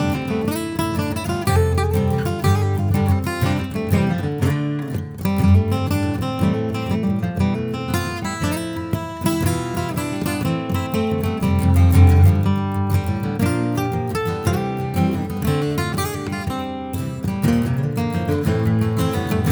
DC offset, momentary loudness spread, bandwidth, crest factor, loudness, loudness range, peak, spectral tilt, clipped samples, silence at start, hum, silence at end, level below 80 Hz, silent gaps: under 0.1%; 8 LU; over 20 kHz; 18 dB; -20 LUFS; 5 LU; -2 dBFS; -7 dB/octave; under 0.1%; 0 s; none; 0 s; -34 dBFS; none